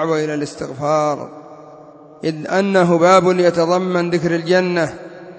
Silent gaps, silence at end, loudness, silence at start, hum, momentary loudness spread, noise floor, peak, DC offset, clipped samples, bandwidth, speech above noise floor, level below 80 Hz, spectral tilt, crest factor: none; 0 s; -16 LUFS; 0 s; none; 14 LU; -40 dBFS; 0 dBFS; under 0.1%; under 0.1%; 8 kHz; 24 dB; -58 dBFS; -6 dB/octave; 18 dB